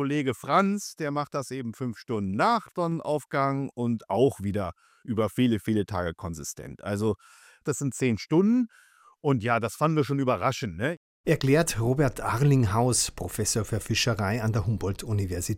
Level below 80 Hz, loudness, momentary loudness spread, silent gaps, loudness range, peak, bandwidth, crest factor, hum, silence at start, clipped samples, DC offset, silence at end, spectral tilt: -50 dBFS; -27 LUFS; 10 LU; 10.97-11.24 s; 4 LU; -8 dBFS; 16.5 kHz; 18 dB; none; 0 s; under 0.1%; under 0.1%; 0 s; -5.5 dB/octave